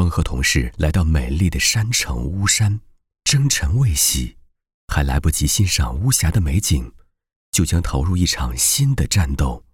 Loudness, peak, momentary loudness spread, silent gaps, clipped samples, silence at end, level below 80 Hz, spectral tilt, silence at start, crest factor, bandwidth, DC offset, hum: -18 LUFS; -4 dBFS; 7 LU; 4.74-4.88 s, 7.36-7.53 s; under 0.1%; 0.15 s; -26 dBFS; -3.5 dB/octave; 0 s; 14 dB; 19.5 kHz; under 0.1%; none